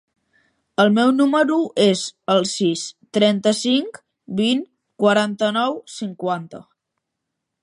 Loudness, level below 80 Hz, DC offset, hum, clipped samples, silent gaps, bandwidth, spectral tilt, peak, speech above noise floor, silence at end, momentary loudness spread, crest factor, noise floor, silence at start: -19 LUFS; -70 dBFS; under 0.1%; none; under 0.1%; none; 11.5 kHz; -4.5 dB/octave; -2 dBFS; 61 dB; 1 s; 12 LU; 18 dB; -80 dBFS; 0.8 s